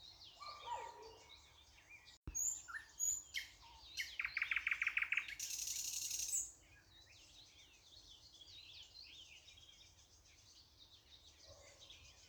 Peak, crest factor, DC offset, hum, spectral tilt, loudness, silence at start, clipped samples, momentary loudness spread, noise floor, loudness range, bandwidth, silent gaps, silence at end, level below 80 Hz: -26 dBFS; 22 dB; under 0.1%; none; 1.5 dB/octave; -42 LUFS; 0 s; under 0.1%; 24 LU; -67 dBFS; 18 LU; over 20 kHz; 2.17-2.23 s; 0 s; -70 dBFS